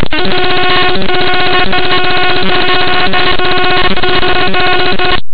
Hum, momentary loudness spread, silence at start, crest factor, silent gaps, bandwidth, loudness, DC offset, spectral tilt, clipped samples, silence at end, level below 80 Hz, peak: none; 2 LU; 0 s; 14 dB; none; 4 kHz; -10 LUFS; 40%; -7.5 dB/octave; under 0.1%; 0 s; -28 dBFS; 0 dBFS